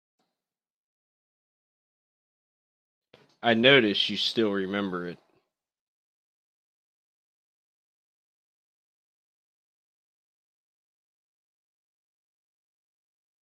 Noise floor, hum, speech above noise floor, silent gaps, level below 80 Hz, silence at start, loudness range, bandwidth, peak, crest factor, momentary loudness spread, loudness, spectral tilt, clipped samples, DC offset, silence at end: under -90 dBFS; none; over 66 dB; none; -76 dBFS; 3.45 s; 13 LU; 13 kHz; -4 dBFS; 28 dB; 15 LU; -23 LUFS; -5 dB/octave; under 0.1%; under 0.1%; 8.3 s